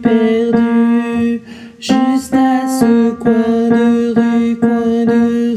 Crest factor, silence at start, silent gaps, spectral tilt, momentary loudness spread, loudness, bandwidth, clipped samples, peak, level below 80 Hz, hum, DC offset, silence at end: 12 dB; 0 s; none; -6 dB/octave; 4 LU; -13 LUFS; 12.5 kHz; under 0.1%; 0 dBFS; -48 dBFS; none; under 0.1%; 0 s